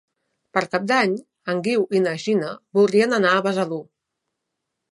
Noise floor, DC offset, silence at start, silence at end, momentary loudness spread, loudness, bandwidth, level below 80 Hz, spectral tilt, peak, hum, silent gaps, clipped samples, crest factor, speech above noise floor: -80 dBFS; under 0.1%; 0.55 s; 1.1 s; 9 LU; -21 LUFS; 11.5 kHz; -72 dBFS; -5.5 dB/octave; -2 dBFS; none; none; under 0.1%; 20 dB; 60 dB